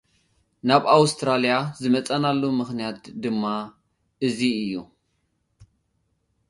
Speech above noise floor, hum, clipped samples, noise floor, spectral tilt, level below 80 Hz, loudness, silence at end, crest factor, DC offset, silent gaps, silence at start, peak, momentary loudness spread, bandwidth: 50 dB; none; under 0.1%; -72 dBFS; -5 dB/octave; -64 dBFS; -23 LUFS; 0.85 s; 24 dB; under 0.1%; none; 0.65 s; 0 dBFS; 13 LU; 11.5 kHz